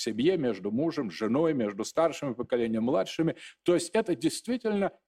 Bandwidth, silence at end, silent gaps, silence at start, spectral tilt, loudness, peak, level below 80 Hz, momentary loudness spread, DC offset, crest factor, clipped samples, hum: 14.5 kHz; 0.2 s; none; 0 s; -5.5 dB/octave; -29 LUFS; -12 dBFS; -66 dBFS; 5 LU; under 0.1%; 16 dB; under 0.1%; none